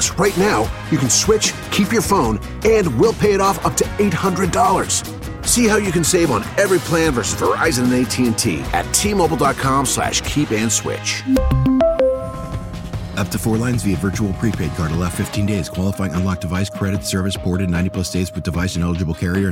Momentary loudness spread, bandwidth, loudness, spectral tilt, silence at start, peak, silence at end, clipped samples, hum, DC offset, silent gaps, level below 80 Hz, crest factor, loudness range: 6 LU; 17 kHz; -18 LUFS; -4.5 dB/octave; 0 s; -2 dBFS; 0 s; under 0.1%; none; under 0.1%; none; -32 dBFS; 14 dB; 4 LU